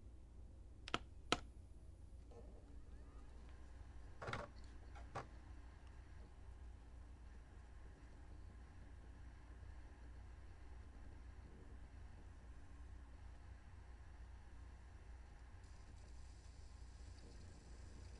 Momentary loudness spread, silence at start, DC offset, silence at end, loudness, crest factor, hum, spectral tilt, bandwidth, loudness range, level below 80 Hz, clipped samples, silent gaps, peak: 12 LU; 0 s; under 0.1%; 0 s; -56 LUFS; 36 dB; none; -4.5 dB/octave; 11 kHz; 10 LU; -58 dBFS; under 0.1%; none; -18 dBFS